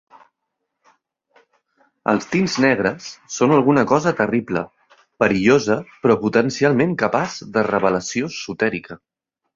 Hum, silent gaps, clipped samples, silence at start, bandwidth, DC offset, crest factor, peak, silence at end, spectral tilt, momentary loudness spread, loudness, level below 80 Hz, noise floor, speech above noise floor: none; none; under 0.1%; 2.05 s; 7.8 kHz; under 0.1%; 18 dB; -2 dBFS; 0.6 s; -5.5 dB/octave; 10 LU; -19 LUFS; -56 dBFS; -78 dBFS; 59 dB